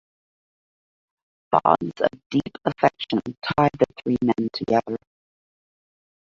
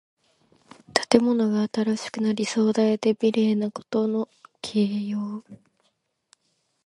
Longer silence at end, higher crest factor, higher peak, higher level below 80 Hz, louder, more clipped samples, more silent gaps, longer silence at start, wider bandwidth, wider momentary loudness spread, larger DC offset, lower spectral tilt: about the same, 1.35 s vs 1.3 s; about the same, 22 dB vs 24 dB; about the same, -2 dBFS vs 0 dBFS; first, -56 dBFS vs -68 dBFS; about the same, -23 LUFS vs -24 LUFS; neither; first, 2.26-2.30 s, 3.38-3.42 s vs none; first, 1.5 s vs 0.9 s; second, 7.6 kHz vs 11.5 kHz; second, 7 LU vs 10 LU; neither; first, -7.5 dB/octave vs -5.5 dB/octave